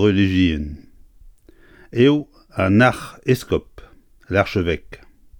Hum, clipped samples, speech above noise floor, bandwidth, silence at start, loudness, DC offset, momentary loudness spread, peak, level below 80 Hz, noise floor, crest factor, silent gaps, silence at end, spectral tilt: none; under 0.1%; 31 dB; 19 kHz; 0 s; -19 LUFS; under 0.1%; 13 LU; -2 dBFS; -40 dBFS; -49 dBFS; 18 dB; none; 0.45 s; -7 dB/octave